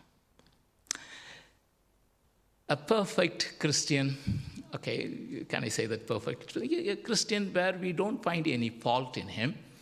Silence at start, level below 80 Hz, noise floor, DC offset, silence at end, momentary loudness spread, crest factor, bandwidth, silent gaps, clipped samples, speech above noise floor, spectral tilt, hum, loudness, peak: 0.9 s; -60 dBFS; -70 dBFS; under 0.1%; 0.05 s; 10 LU; 22 dB; 15 kHz; none; under 0.1%; 38 dB; -4 dB/octave; none; -32 LUFS; -10 dBFS